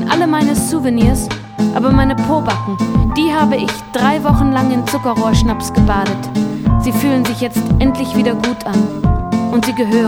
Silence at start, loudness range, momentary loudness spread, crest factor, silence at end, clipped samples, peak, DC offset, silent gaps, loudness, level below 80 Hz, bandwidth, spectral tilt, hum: 0 s; 1 LU; 5 LU; 14 dB; 0 s; under 0.1%; 0 dBFS; under 0.1%; none; -15 LUFS; -24 dBFS; 17.5 kHz; -6 dB/octave; none